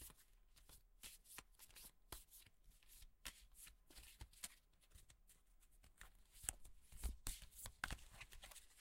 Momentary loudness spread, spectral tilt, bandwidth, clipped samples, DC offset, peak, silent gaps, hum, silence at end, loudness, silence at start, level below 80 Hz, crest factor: 16 LU; -1.5 dB/octave; 16 kHz; under 0.1%; under 0.1%; -18 dBFS; none; none; 0 s; -56 LUFS; 0 s; -62 dBFS; 40 dB